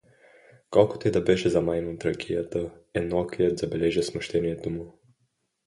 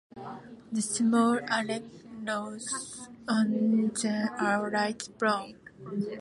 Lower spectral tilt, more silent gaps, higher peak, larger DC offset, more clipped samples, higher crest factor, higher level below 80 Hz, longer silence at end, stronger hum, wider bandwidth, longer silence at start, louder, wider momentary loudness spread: first, -6.5 dB/octave vs -4 dB/octave; neither; first, -4 dBFS vs -12 dBFS; neither; neither; about the same, 22 dB vs 18 dB; first, -50 dBFS vs -70 dBFS; first, 0.75 s vs 0 s; neither; about the same, 11.5 kHz vs 11.5 kHz; first, 0.7 s vs 0.15 s; first, -26 LUFS vs -29 LUFS; second, 10 LU vs 18 LU